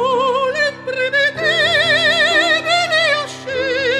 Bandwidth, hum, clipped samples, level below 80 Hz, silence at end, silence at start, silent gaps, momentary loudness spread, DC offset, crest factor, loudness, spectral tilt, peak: 13.5 kHz; none; under 0.1%; -60 dBFS; 0 s; 0 s; none; 7 LU; under 0.1%; 14 dB; -15 LUFS; -2 dB/octave; -2 dBFS